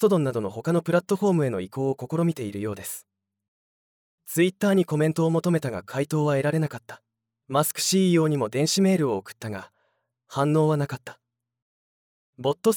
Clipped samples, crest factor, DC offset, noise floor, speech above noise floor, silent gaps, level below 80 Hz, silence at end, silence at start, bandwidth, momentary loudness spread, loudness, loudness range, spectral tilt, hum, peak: under 0.1%; 18 dB; under 0.1%; -73 dBFS; 49 dB; 3.48-4.18 s, 11.62-12.33 s; -72 dBFS; 0 s; 0 s; over 20 kHz; 13 LU; -24 LUFS; 5 LU; -5.5 dB/octave; none; -8 dBFS